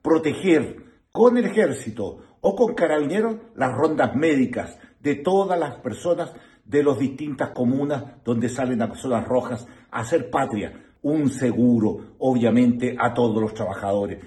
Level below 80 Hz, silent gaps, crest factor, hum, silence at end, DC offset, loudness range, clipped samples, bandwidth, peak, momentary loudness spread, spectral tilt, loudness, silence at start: -56 dBFS; none; 18 dB; none; 0 s; under 0.1%; 3 LU; under 0.1%; 12 kHz; -4 dBFS; 11 LU; -7 dB/octave; -22 LUFS; 0.05 s